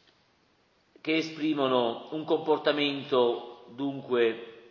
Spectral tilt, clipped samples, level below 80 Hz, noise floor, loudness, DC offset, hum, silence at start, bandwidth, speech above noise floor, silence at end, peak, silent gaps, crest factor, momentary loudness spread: -5.5 dB/octave; under 0.1%; -78 dBFS; -67 dBFS; -28 LUFS; under 0.1%; none; 1.05 s; 6.8 kHz; 40 dB; 0.1 s; -10 dBFS; none; 18 dB; 11 LU